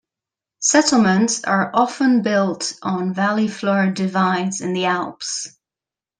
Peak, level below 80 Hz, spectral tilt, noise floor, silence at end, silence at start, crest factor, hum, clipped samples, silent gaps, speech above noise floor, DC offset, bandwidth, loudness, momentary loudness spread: -2 dBFS; -64 dBFS; -4 dB/octave; -89 dBFS; 0.7 s; 0.6 s; 16 dB; none; under 0.1%; none; 71 dB; under 0.1%; 10 kHz; -18 LUFS; 9 LU